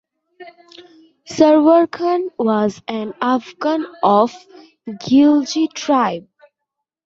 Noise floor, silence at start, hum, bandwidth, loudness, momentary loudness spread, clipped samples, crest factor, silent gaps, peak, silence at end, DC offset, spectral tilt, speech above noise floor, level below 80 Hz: -80 dBFS; 0.4 s; none; 7.8 kHz; -16 LUFS; 14 LU; under 0.1%; 16 dB; none; -2 dBFS; 0.85 s; under 0.1%; -5.5 dB/octave; 64 dB; -62 dBFS